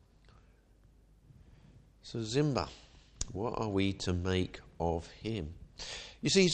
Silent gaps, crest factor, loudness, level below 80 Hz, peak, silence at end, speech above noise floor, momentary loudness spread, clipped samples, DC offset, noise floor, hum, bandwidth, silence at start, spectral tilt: none; 24 dB; -35 LUFS; -54 dBFS; -12 dBFS; 0 s; 30 dB; 13 LU; under 0.1%; under 0.1%; -63 dBFS; none; 9.6 kHz; 2.05 s; -5 dB/octave